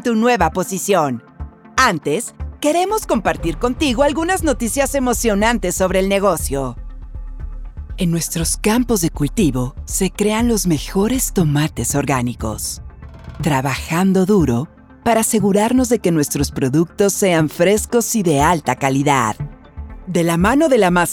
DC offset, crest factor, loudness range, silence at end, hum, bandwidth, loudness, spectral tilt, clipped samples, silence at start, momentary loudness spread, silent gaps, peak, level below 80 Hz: under 0.1%; 16 dB; 3 LU; 0 s; none; 18 kHz; -17 LUFS; -5 dB/octave; under 0.1%; 0 s; 15 LU; none; 0 dBFS; -32 dBFS